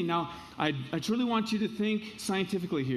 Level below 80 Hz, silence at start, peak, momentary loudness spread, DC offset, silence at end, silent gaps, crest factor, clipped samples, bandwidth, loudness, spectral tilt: -64 dBFS; 0 s; -12 dBFS; 5 LU; under 0.1%; 0 s; none; 18 dB; under 0.1%; 14 kHz; -31 LUFS; -5.5 dB/octave